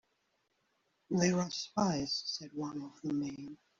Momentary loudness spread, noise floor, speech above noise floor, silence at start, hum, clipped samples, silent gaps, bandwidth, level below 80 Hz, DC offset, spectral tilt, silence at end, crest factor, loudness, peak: 11 LU; -79 dBFS; 43 dB; 1.1 s; none; under 0.1%; none; 7.6 kHz; -68 dBFS; under 0.1%; -5 dB/octave; 0.25 s; 22 dB; -35 LUFS; -16 dBFS